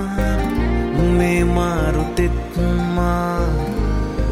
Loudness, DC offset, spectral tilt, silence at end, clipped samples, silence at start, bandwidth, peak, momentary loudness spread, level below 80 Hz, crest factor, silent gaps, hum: -19 LUFS; under 0.1%; -7 dB/octave; 0 s; under 0.1%; 0 s; 14.5 kHz; -6 dBFS; 5 LU; -22 dBFS; 12 dB; none; none